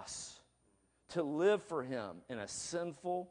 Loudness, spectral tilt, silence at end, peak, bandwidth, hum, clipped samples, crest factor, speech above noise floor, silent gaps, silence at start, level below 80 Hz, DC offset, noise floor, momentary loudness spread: -38 LUFS; -4 dB/octave; 0 s; -22 dBFS; 10.5 kHz; none; under 0.1%; 18 dB; 37 dB; none; 0 s; -76 dBFS; under 0.1%; -74 dBFS; 13 LU